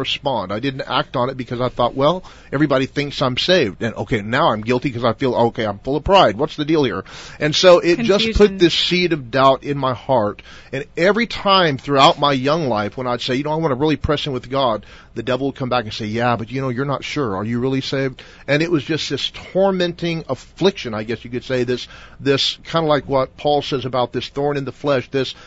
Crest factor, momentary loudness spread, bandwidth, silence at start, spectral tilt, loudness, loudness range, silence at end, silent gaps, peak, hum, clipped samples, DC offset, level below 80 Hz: 18 dB; 11 LU; 8 kHz; 0 s; -5.5 dB/octave; -18 LUFS; 6 LU; 0 s; none; 0 dBFS; none; under 0.1%; under 0.1%; -40 dBFS